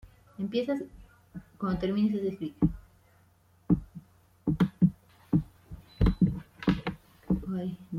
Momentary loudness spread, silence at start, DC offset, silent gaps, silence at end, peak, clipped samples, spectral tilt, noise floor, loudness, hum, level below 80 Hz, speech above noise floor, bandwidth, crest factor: 22 LU; 0.05 s; under 0.1%; none; 0 s; -12 dBFS; under 0.1%; -9 dB/octave; -63 dBFS; -30 LUFS; none; -42 dBFS; 33 dB; 6.6 kHz; 20 dB